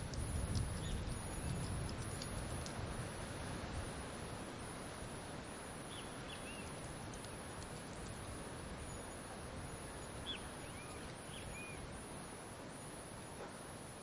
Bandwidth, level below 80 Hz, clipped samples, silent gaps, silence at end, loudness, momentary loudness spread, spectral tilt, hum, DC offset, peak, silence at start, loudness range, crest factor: 11.5 kHz; -54 dBFS; under 0.1%; none; 0 s; -47 LUFS; 7 LU; -4.5 dB/octave; none; under 0.1%; -26 dBFS; 0 s; 4 LU; 20 dB